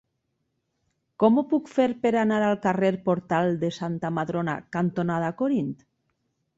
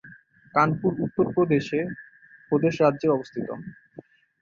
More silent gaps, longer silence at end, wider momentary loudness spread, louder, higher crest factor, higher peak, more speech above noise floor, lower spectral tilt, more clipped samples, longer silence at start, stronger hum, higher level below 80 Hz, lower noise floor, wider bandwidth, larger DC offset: neither; first, 0.85 s vs 0.7 s; second, 7 LU vs 13 LU; about the same, -25 LUFS vs -24 LUFS; about the same, 18 dB vs 20 dB; second, -8 dBFS vs -4 dBFS; first, 53 dB vs 27 dB; about the same, -7.5 dB/octave vs -8 dB/octave; neither; first, 1.2 s vs 0.05 s; neither; about the same, -64 dBFS vs -62 dBFS; first, -77 dBFS vs -50 dBFS; about the same, 7.8 kHz vs 7.4 kHz; neither